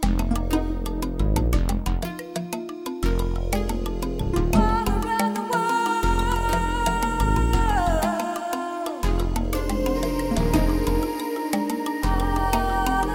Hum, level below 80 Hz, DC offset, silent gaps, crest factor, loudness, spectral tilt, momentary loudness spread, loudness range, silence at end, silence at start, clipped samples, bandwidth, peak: none; -26 dBFS; under 0.1%; none; 18 dB; -24 LUFS; -5.5 dB/octave; 7 LU; 4 LU; 0 s; 0 s; under 0.1%; 17.5 kHz; -6 dBFS